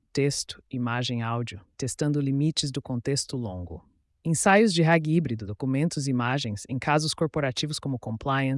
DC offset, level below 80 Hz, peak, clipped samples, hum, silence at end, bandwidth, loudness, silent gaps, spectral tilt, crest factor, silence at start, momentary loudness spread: under 0.1%; -58 dBFS; -10 dBFS; under 0.1%; none; 0 s; 12 kHz; -26 LUFS; none; -5 dB/octave; 16 dB; 0.15 s; 13 LU